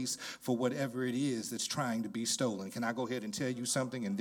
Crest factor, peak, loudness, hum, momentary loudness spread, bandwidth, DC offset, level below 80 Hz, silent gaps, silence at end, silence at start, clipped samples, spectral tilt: 18 dB; -18 dBFS; -35 LUFS; none; 4 LU; 18 kHz; under 0.1%; -78 dBFS; none; 0 s; 0 s; under 0.1%; -4 dB/octave